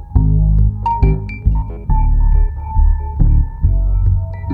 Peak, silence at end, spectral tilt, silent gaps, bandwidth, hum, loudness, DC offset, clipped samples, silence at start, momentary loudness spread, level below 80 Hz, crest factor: 0 dBFS; 0 s; -11.5 dB/octave; none; 2.9 kHz; none; -17 LUFS; under 0.1%; under 0.1%; 0 s; 5 LU; -14 dBFS; 12 dB